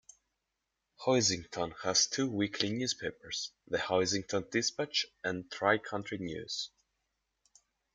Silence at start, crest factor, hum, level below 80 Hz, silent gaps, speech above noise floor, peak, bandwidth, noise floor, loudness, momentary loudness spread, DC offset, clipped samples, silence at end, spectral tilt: 1 s; 24 dB; none; -70 dBFS; none; 52 dB; -12 dBFS; 11.5 kHz; -86 dBFS; -33 LUFS; 10 LU; under 0.1%; under 0.1%; 1.25 s; -2.5 dB/octave